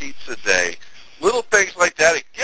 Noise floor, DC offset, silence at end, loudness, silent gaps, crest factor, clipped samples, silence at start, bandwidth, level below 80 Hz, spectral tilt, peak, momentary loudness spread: -41 dBFS; under 0.1%; 0 s; -18 LUFS; none; 20 dB; under 0.1%; 0 s; 8 kHz; -54 dBFS; -1 dB/octave; 0 dBFS; 9 LU